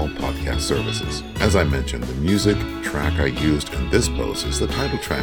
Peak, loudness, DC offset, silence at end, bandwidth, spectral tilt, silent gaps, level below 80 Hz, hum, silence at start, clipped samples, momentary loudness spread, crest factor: -2 dBFS; -22 LUFS; under 0.1%; 0 s; 19 kHz; -5 dB/octave; none; -28 dBFS; none; 0 s; under 0.1%; 6 LU; 20 dB